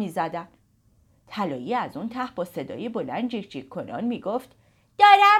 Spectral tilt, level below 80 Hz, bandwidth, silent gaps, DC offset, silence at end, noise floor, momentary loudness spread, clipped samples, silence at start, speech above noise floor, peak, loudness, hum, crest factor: -5 dB/octave; -68 dBFS; 14.5 kHz; none; under 0.1%; 0 s; -62 dBFS; 17 LU; under 0.1%; 0 s; 39 dB; -4 dBFS; -25 LUFS; none; 20 dB